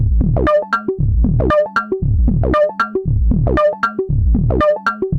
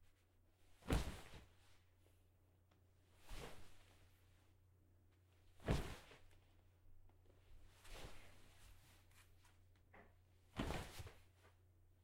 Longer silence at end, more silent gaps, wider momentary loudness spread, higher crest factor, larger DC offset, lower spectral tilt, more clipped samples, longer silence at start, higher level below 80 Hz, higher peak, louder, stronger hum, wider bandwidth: second, 0 s vs 0.15 s; neither; second, 4 LU vs 24 LU; second, 12 dB vs 30 dB; neither; first, -9 dB/octave vs -5.5 dB/octave; neither; about the same, 0 s vs 0 s; first, -20 dBFS vs -58 dBFS; first, -2 dBFS vs -22 dBFS; first, -16 LUFS vs -50 LUFS; neither; second, 6.4 kHz vs 16 kHz